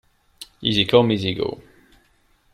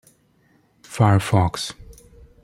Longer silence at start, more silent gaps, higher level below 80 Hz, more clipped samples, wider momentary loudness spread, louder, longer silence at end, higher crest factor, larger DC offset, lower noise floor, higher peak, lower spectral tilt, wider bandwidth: second, 0.4 s vs 0.9 s; neither; about the same, -52 dBFS vs -48 dBFS; neither; first, 25 LU vs 19 LU; about the same, -20 LUFS vs -20 LUFS; first, 0.95 s vs 0.5 s; about the same, 20 dB vs 20 dB; neither; about the same, -60 dBFS vs -60 dBFS; about the same, -2 dBFS vs -2 dBFS; about the same, -6 dB/octave vs -6 dB/octave; about the same, 13.5 kHz vs 13 kHz